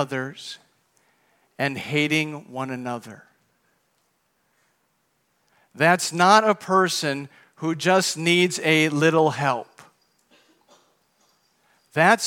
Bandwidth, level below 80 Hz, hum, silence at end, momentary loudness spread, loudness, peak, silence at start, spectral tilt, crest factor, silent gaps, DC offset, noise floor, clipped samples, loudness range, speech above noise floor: 18 kHz; -78 dBFS; none; 0 s; 15 LU; -21 LUFS; -2 dBFS; 0 s; -4 dB/octave; 22 dB; none; under 0.1%; -70 dBFS; under 0.1%; 10 LU; 48 dB